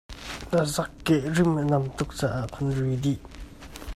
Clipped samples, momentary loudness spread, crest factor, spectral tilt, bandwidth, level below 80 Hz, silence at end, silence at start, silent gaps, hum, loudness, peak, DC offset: under 0.1%; 17 LU; 16 dB; -6 dB/octave; 14.5 kHz; -44 dBFS; 0 s; 0.1 s; none; none; -26 LUFS; -10 dBFS; under 0.1%